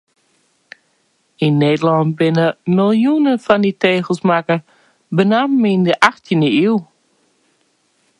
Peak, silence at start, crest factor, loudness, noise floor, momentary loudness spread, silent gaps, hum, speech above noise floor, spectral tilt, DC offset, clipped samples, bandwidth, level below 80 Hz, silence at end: 0 dBFS; 1.4 s; 16 dB; -15 LUFS; -62 dBFS; 4 LU; none; none; 48 dB; -7 dB/octave; under 0.1%; under 0.1%; 11 kHz; -62 dBFS; 1.35 s